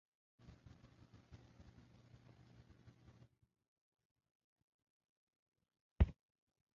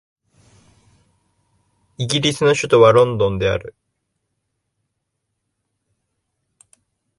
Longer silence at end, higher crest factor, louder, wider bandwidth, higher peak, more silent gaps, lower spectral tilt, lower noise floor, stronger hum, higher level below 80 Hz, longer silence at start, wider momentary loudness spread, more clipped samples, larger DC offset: second, 0.65 s vs 3.5 s; first, 30 dB vs 20 dB; second, -40 LUFS vs -16 LUFS; second, 6.6 kHz vs 11.5 kHz; second, -20 dBFS vs 0 dBFS; neither; first, -8.5 dB/octave vs -5 dB/octave; second, -66 dBFS vs -76 dBFS; neither; about the same, -50 dBFS vs -48 dBFS; first, 6 s vs 2 s; first, 27 LU vs 11 LU; neither; neither